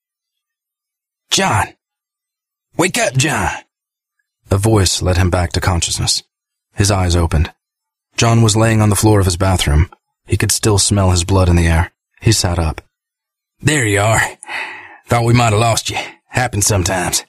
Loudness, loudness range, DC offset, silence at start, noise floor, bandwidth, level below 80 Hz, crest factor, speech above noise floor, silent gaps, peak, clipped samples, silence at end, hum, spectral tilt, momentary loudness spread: -15 LUFS; 5 LU; under 0.1%; 1.3 s; -84 dBFS; 15.5 kHz; -28 dBFS; 16 dB; 70 dB; none; 0 dBFS; under 0.1%; 0.05 s; none; -4.5 dB/octave; 10 LU